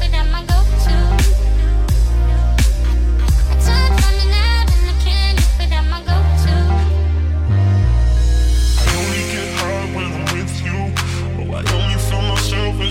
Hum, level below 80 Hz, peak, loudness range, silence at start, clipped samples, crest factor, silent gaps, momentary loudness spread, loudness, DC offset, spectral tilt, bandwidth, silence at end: none; -14 dBFS; -2 dBFS; 4 LU; 0 s; under 0.1%; 12 dB; none; 6 LU; -16 LUFS; under 0.1%; -5 dB/octave; 15.5 kHz; 0 s